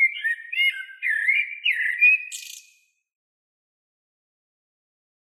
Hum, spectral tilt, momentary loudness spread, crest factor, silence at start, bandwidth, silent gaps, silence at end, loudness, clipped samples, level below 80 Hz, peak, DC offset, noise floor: none; 12.5 dB/octave; 15 LU; 18 dB; 0 s; 14 kHz; none; 2.7 s; -20 LUFS; under 0.1%; under -90 dBFS; -8 dBFS; under 0.1%; -60 dBFS